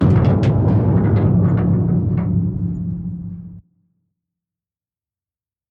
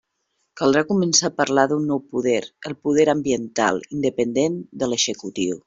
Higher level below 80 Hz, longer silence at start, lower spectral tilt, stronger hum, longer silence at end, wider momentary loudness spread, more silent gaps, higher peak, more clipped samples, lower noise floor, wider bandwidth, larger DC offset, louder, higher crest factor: first, -34 dBFS vs -60 dBFS; second, 0 s vs 0.55 s; first, -11 dB/octave vs -3.5 dB/octave; neither; first, 2.1 s vs 0.05 s; first, 13 LU vs 7 LU; neither; about the same, -2 dBFS vs -4 dBFS; neither; first, under -90 dBFS vs -73 dBFS; second, 5.2 kHz vs 7.8 kHz; neither; first, -17 LUFS vs -21 LUFS; about the same, 16 dB vs 18 dB